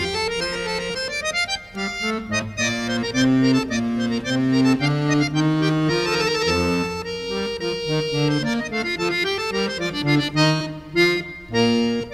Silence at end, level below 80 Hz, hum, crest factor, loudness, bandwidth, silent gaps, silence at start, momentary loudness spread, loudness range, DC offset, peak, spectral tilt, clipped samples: 0 s; -46 dBFS; none; 16 dB; -21 LUFS; 14.5 kHz; none; 0 s; 7 LU; 3 LU; under 0.1%; -4 dBFS; -5 dB/octave; under 0.1%